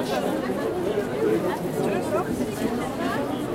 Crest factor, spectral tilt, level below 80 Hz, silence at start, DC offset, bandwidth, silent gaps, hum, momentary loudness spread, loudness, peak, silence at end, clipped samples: 14 dB; -6 dB/octave; -50 dBFS; 0 s; under 0.1%; 16.5 kHz; none; none; 3 LU; -26 LUFS; -12 dBFS; 0 s; under 0.1%